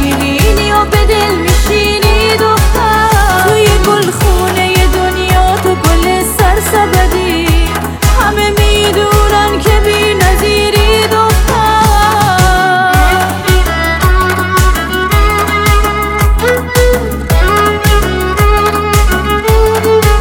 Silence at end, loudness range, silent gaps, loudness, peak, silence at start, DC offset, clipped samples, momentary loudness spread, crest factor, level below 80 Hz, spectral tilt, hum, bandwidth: 0 s; 2 LU; none; -9 LUFS; 0 dBFS; 0 s; under 0.1%; under 0.1%; 3 LU; 8 dB; -14 dBFS; -4.5 dB/octave; none; 18 kHz